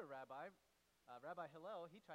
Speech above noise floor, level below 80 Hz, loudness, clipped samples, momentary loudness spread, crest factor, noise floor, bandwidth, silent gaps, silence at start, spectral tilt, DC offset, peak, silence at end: 26 dB; under -90 dBFS; -55 LUFS; under 0.1%; 6 LU; 16 dB; -81 dBFS; 15.5 kHz; none; 0 s; -5.5 dB/octave; under 0.1%; -40 dBFS; 0 s